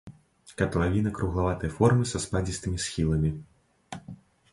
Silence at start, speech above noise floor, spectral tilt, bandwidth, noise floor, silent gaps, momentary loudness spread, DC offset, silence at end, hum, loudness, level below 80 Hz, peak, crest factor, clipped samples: 0.05 s; 24 dB; -6 dB/octave; 11.5 kHz; -50 dBFS; none; 20 LU; under 0.1%; 0.4 s; none; -27 LUFS; -40 dBFS; -8 dBFS; 20 dB; under 0.1%